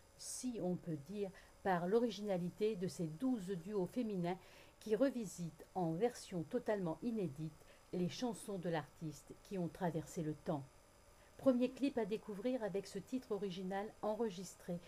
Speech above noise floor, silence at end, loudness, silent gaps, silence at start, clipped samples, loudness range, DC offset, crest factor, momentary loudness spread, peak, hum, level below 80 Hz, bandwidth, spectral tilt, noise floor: 24 dB; 0 s; -42 LUFS; none; 0.15 s; under 0.1%; 3 LU; under 0.1%; 20 dB; 11 LU; -22 dBFS; none; -70 dBFS; 15.5 kHz; -6 dB/octave; -65 dBFS